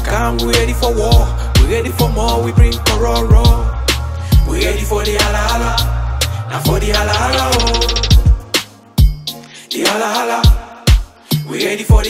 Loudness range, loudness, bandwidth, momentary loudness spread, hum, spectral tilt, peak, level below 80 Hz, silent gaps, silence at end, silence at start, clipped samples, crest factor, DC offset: 2 LU; -14 LUFS; 16 kHz; 6 LU; none; -4.5 dB/octave; 0 dBFS; -16 dBFS; none; 0 s; 0 s; under 0.1%; 12 dB; under 0.1%